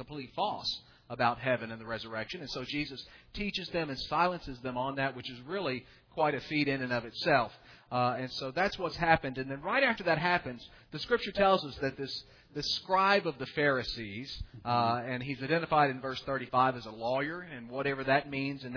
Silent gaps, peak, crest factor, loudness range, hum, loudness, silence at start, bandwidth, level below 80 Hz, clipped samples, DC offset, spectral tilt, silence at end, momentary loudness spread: none; -10 dBFS; 22 dB; 5 LU; none; -32 LUFS; 0 s; 5.4 kHz; -56 dBFS; under 0.1%; under 0.1%; -5.5 dB/octave; 0 s; 13 LU